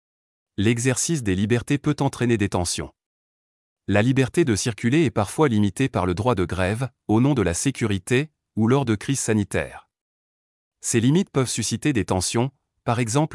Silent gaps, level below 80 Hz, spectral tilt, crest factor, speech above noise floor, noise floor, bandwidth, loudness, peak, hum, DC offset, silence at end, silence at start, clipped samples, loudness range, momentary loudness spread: 3.06-3.76 s, 10.01-10.71 s; -52 dBFS; -5.5 dB/octave; 16 dB; over 69 dB; under -90 dBFS; 12 kHz; -22 LUFS; -6 dBFS; none; under 0.1%; 0 s; 0.6 s; under 0.1%; 2 LU; 7 LU